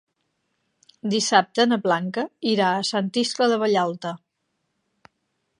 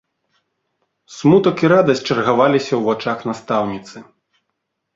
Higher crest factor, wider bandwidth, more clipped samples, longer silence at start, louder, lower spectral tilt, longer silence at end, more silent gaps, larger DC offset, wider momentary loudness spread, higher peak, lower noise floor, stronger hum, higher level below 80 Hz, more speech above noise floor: first, 22 dB vs 16 dB; first, 11 kHz vs 7.8 kHz; neither; about the same, 1.05 s vs 1.1 s; second, -22 LUFS vs -16 LUFS; second, -4 dB/octave vs -6.5 dB/octave; first, 1.45 s vs 0.95 s; neither; neither; about the same, 12 LU vs 10 LU; about the same, -2 dBFS vs -2 dBFS; about the same, -75 dBFS vs -75 dBFS; neither; second, -76 dBFS vs -58 dBFS; second, 54 dB vs 59 dB